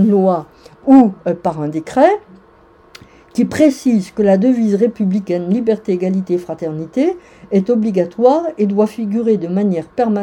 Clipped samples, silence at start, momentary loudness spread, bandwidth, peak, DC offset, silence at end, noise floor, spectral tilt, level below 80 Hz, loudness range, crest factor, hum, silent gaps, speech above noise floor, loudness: 0.1%; 0 s; 8 LU; 12 kHz; 0 dBFS; under 0.1%; 0 s; -47 dBFS; -8 dB/octave; -54 dBFS; 2 LU; 14 dB; none; none; 32 dB; -15 LUFS